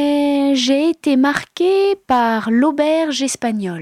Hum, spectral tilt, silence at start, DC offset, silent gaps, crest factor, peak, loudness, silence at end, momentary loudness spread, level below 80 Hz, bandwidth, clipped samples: none; -4 dB/octave; 0 s; under 0.1%; none; 10 dB; -4 dBFS; -16 LUFS; 0 s; 4 LU; -56 dBFS; 13.5 kHz; under 0.1%